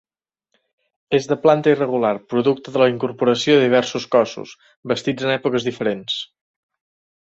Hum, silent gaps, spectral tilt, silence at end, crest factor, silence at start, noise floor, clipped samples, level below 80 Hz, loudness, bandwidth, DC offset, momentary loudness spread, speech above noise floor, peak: none; 4.76-4.83 s; -5.5 dB/octave; 1.05 s; 18 dB; 1.1 s; -74 dBFS; under 0.1%; -62 dBFS; -19 LUFS; 8 kHz; under 0.1%; 10 LU; 55 dB; -2 dBFS